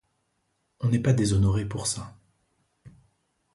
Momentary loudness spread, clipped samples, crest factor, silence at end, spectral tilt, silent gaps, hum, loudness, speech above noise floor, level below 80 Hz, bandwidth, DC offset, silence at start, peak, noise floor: 10 LU; under 0.1%; 18 dB; 0.65 s; -6 dB/octave; none; none; -26 LUFS; 50 dB; -44 dBFS; 11.5 kHz; under 0.1%; 0.8 s; -10 dBFS; -74 dBFS